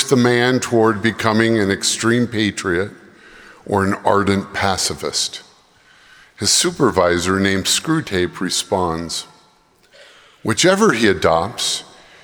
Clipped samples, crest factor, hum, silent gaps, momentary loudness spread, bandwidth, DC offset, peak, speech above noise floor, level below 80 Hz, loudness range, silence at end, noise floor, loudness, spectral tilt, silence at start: under 0.1%; 18 dB; none; none; 8 LU; over 20 kHz; under 0.1%; 0 dBFS; 37 dB; -52 dBFS; 3 LU; 0.4 s; -54 dBFS; -17 LUFS; -3.5 dB/octave; 0 s